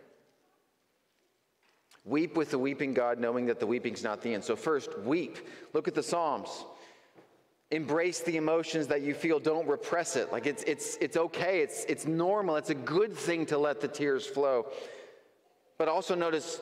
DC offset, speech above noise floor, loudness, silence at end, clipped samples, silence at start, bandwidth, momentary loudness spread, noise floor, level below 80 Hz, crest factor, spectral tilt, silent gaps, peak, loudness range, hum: under 0.1%; 44 dB; -31 LUFS; 0 s; under 0.1%; 2.05 s; 15 kHz; 6 LU; -75 dBFS; -80 dBFS; 16 dB; -4.5 dB/octave; none; -16 dBFS; 4 LU; none